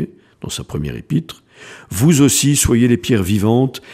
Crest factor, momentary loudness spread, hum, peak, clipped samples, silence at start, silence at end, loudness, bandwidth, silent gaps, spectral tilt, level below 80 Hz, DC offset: 16 dB; 16 LU; none; 0 dBFS; under 0.1%; 0 s; 0 s; -15 LUFS; 15.5 kHz; none; -5 dB/octave; -36 dBFS; under 0.1%